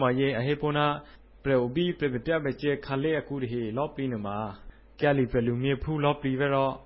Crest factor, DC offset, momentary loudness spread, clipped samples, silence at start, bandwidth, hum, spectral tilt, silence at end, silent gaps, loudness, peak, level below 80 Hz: 18 dB; under 0.1%; 7 LU; under 0.1%; 0 s; 5.8 kHz; none; -11 dB/octave; 0 s; none; -28 LUFS; -10 dBFS; -50 dBFS